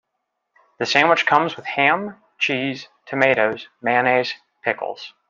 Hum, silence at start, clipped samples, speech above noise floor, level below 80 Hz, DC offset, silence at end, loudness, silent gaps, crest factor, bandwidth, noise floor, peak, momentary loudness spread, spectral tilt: none; 0.8 s; under 0.1%; 57 dB; -70 dBFS; under 0.1%; 0.2 s; -19 LUFS; none; 20 dB; 7.6 kHz; -77 dBFS; -2 dBFS; 12 LU; -4 dB/octave